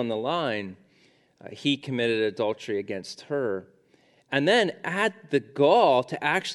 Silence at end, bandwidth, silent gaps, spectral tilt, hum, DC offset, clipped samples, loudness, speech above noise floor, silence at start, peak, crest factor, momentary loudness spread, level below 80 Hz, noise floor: 0 s; 12 kHz; none; -5 dB/octave; none; under 0.1%; under 0.1%; -25 LUFS; 37 dB; 0 s; -6 dBFS; 20 dB; 12 LU; -76 dBFS; -62 dBFS